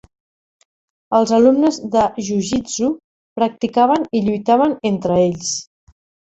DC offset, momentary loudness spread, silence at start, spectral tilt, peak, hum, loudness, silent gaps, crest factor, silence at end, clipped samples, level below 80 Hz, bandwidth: under 0.1%; 9 LU; 1.1 s; -5 dB/octave; -2 dBFS; none; -17 LUFS; 3.04-3.36 s; 16 dB; 0.65 s; under 0.1%; -52 dBFS; 8.2 kHz